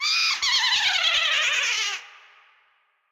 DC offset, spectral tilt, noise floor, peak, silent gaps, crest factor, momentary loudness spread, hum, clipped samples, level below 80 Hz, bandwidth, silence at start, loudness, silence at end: under 0.1%; 4 dB/octave; -66 dBFS; -10 dBFS; none; 14 dB; 6 LU; none; under 0.1%; -64 dBFS; 17 kHz; 0 s; -20 LUFS; 0.95 s